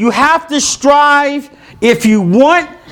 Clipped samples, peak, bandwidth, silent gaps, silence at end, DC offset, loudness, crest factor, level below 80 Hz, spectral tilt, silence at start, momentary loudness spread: 0.3%; 0 dBFS; 18.5 kHz; none; 0 s; under 0.1%; -10 LUFS; 10 dB; -46 dBFS; -4 dB/octave; 0 s; 6 LU